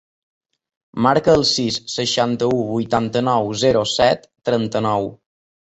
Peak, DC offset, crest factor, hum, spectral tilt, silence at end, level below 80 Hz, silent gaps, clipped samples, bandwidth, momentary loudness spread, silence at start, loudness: -2 dBFS; under 0.1%; 18 dB; none; -4.5 dB/octave; 0.55 s; -50 dBFS; none; under 0.1%; 8.2 kHz; 7 LU; 0.95 s; -18 LUFS